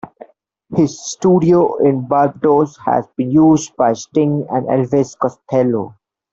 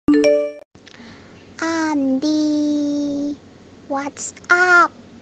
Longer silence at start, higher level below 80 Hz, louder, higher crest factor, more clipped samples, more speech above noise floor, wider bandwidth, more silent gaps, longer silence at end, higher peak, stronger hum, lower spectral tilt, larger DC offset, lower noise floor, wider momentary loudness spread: about the same, 0.05 s vs 0.1 s; about the same, -54 dBFS vs -54 dBFS; about the same, -15 LUFS vs -17 LUFS; about the same, 14 dB vs 16 dB; neither; first, 33 dB vs 27 dB; second, 7.8 kHz vs 9 kHz; second, none vs 0.65-0.71 s; first, 0.4 s vs 0.05 s; about the same, -2 dBFS vs -2 dBFS; neither; first, -7 dB/octave vs -3.5 dB/octave; neither; first, -47 dBFS vs -43 dBFS; second, 7 LU vs 15 LU